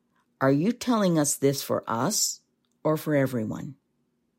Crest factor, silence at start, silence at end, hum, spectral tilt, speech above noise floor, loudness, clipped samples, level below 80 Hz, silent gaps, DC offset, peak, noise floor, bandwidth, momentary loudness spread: 18 dB; 0.4 s; 0.65 s; none; -4.5 dB/octave; 48 dB; -25 LUFS; under 0.1%; -68 dBFS; none; under 0.1%; -10 dBFS; -73 dBFS; 16.5 kHz; 10 LU